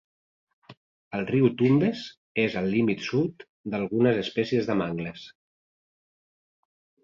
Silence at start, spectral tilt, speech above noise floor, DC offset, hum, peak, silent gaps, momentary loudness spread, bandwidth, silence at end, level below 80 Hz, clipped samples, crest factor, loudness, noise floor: 0.7 s; -7.5 dB/octave; over 65 dB; under 0.1%; none; -8 dBFS; 0.77-1.11 s, 2.17-2.35 s, 3.49-3.64 s; 13 LU; 7.6 kHz; 1.75 s; -62 dBFS; under 0.1%; 18 dB; -26 LUFS; under -90 dBFS